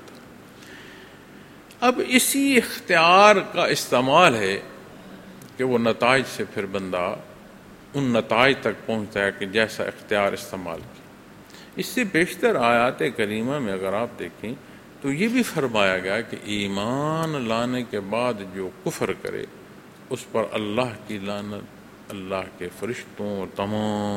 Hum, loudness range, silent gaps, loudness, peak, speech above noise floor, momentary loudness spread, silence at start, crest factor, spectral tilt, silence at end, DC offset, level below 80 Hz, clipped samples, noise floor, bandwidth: none; 11 LU; none; -22 LUFS; 0 dBFS; 23 dB; 17 LU; 0 s; 24 dB; -4 dB/octave; 0 s; under 0.1%; -58 dBFS; under 0.1%; -46 dBFS; 16 kHz